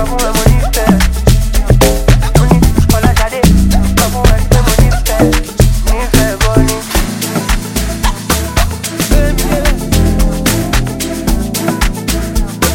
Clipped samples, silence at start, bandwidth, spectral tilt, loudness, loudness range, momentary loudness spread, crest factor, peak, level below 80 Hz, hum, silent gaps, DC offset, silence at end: under 0.1%; 0 s; 17.5 kHz; -5 dB/octave; -12 LUFS; 4 LU; 6 LU; 10 dB; 0 dBFS; -14 dBFS; none; none; under 0.1%; 0 s